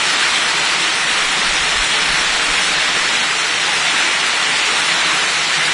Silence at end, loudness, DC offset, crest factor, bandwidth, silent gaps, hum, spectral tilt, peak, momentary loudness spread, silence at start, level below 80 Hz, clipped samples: 0 s; -13 LUFS; under 0.1%; 14 dB; 11 kHz; none; none; 0.5 dB/octave; -2 dBFS; 1 LU; 0 s; -44 dBFS; under 0.1%